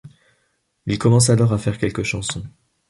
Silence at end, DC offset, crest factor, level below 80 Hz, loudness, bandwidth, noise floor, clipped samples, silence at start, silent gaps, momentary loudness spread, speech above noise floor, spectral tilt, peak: 0.4 s; under 0.1%; 18 dB; -44 dBFS; -19 LUFS; 11.5 kHz; -68 dBFS; under 0.1%; 0.05 s; none; 17 LU; 50 dB; -5.5 dB/octave; -2 dBFS